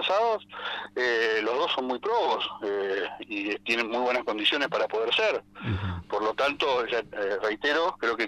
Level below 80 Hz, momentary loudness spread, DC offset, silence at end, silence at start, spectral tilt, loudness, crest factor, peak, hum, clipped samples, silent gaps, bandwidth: -58 dBFS; 8 LU; under 0.1%; 0 s; 0 s; -4.5 dB/octave; -27 LUFS; 16 dB; -12 dBFS; 50 Hz at -60 dBFS; under 0.1%; none; 13 kHz